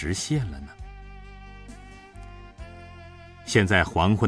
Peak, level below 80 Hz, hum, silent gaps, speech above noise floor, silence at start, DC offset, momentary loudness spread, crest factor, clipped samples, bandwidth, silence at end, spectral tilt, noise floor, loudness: -6 dBFS; -42 dBFS; none; none; 22 dB; 0 s; under 0.1%; 24 LU; 22 dB; under 0.1%; 11 kHz; 0 s; -5 dB/octave; -45 dBFS; -23 LUFS